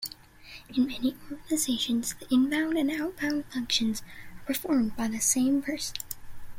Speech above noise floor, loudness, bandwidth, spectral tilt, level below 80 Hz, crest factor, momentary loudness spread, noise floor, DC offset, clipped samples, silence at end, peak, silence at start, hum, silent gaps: 21 dB; -28 LUFS; 16.5 kHz; -2.5 dB/octave; -54 dBFS; 18 dB; 16 LU; -49 dBFS; under 0.1%; under 0.1%; 0 s; -10 dBFS; 0 s; none; none